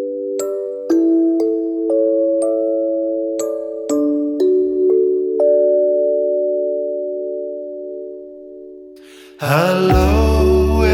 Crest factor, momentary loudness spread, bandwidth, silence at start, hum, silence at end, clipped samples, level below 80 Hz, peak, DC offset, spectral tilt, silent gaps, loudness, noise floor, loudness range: 16 dB; 14 LU; 16.5 kHz; 0 s; none; 0 s; under 0.1%; -28 dBFS; -2 dBFS; under 0.1%; -7 dB/octave; none; -17 LUFS; -40 dBFS; 6 LU